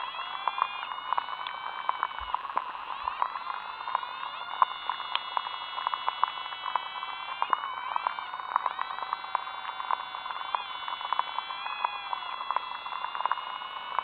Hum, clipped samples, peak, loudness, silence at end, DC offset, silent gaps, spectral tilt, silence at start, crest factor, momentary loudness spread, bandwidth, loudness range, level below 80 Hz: none; under 0.1%; -6 dBFS; -33 LUFS; 0 s; under 0.1%; none; -3 dB/octave; 0 s; 28 dB; 6 LU; 5 kHz; 2 LU; -68 dBFS